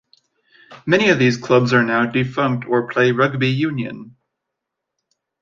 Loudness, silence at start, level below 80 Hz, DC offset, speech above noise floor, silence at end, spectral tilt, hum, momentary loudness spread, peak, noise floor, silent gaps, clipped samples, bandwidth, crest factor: -17 LUFS; 0.7 s; -58 dBFS; under 0.1%; 63 dB; 1.3 s; -6.5 dB/octave; none; 10 LU; -2 dBFS; -80 dBFS; none; under 0.1%; 7.4 kHz; 18 dB